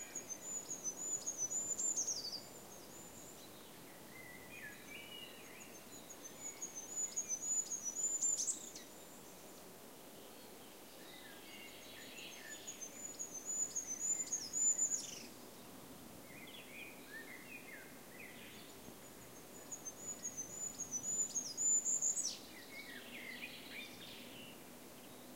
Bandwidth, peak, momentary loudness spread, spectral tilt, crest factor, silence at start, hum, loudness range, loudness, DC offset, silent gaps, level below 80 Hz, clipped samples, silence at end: 16 kHz; -26 dBFS; 20 LU; 0 dB/octave; 18 dB; 0 s; none; 14 LU; -40 LUFS; under 0.1%; none; -78 dBFS; under 0.1%; 0 s